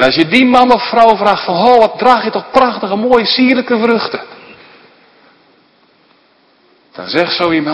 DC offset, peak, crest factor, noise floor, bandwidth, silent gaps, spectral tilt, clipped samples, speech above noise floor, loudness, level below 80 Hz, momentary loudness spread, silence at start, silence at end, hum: under 0.1%; 0 dBFS; 12 dB; -51 dBFS; 11 kHz; none; -5.5 dB/octave; 0.7%; 41 dB; -10 LUFS; -48 dBFS; 8 LU; 0 s; 0 s; none